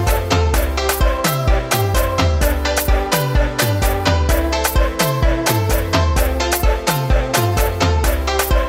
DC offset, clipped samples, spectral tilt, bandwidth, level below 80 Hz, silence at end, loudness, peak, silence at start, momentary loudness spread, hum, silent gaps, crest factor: under 0.1%; under 0.1%; -4.5 dB/octave; 16.5 kHz; -20 dBFS; 0 s; -17 LUFS; -2 dBFS; 0 s; 2 LU; none; none; 14 dB